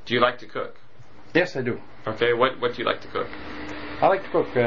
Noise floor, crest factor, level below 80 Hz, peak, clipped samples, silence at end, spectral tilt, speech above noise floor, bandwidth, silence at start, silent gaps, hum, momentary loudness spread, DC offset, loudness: -50 dBFS; 20 dB; -54 dBFS; -6 dBFS; under 0.1%; 0 s; -3 dB/octave; 26 dB; 7.4 kHz; 0.05 s; none; none; 14 LU; 1%; -25 LUFS